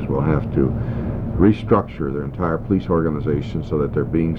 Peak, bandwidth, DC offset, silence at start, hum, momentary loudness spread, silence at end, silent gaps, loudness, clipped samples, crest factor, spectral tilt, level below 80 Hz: -4 dBFS; 6.6 kHz; under 0.1%; 0 s; none; 8 LU; 0 s; none; -20 LUFS; under 0.1%; 16 dB; -10.5 dB/octave; -32 dBFS